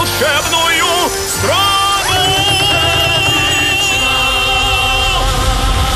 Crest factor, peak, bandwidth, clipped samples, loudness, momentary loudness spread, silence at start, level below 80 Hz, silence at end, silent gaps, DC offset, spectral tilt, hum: 12 dB; -2 dBFS; 16 kHz; under 0.1%; -11 LUFS; 4 LU; 0 s; -24 dBFS; 0 s; none; under 0.1%; -2 dB/octave; none